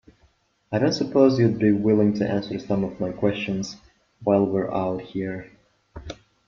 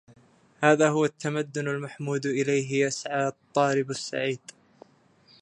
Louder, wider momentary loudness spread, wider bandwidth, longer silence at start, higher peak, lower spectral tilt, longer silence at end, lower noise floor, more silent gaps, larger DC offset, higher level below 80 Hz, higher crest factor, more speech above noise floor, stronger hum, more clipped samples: first, -23 LUFS vs -26 LUFS; first, 16 LU vs 10 LU; second, 7.2 kHz vs 10.5 kHz; about the same, 0.7 s vs 0.6 s; about the same, -4 dBFS vs -4 dBFS; first, -7 dB/octave vs -5 dB/octave; second, 0.35 s vs 1.05 s; about the same, -63 dBFS vs -60 dBFS; neither; neither; first, -54 dBFS vs -76 dBFS; about the same, 18 dB vs 22 dB; first, 41 dB vs 34 dB; neither; neither